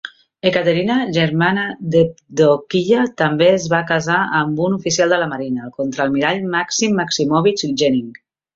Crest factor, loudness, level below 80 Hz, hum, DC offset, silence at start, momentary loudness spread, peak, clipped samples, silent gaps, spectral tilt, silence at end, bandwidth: 16 dB; -17 LUFS; -56 dBFS; none; under 0.1%; 0.05 s; 6 LU; 0 dBFS; under 0.1%; none; -4.5 dB/octave; 0.45 s; 7.8 kHz